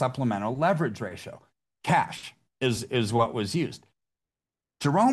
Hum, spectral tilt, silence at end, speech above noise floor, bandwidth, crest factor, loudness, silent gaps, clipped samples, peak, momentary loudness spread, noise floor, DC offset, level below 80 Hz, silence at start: none; -6 dB/octave; 0 s; over 64 dB; 12.5 kHz; 18 dB; -27 LUFS; none; under 0.1%; -10 dBFS; 16 LU; under -90 dBFS; under 0.1%; -64 dBFS; 0 s